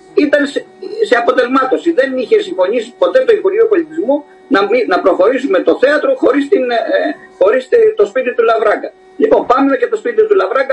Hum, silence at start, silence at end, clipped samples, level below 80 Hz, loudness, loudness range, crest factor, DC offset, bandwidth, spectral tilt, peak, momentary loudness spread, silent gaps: none; 0.15 s; 0 s; under 0.1%; -56 dBFS; -12 LUFS; 1 LU; 12 dB; under 0.1%; 9.2 kHz; -4.5 dB/octave; 0 dBFS; 6 LU; none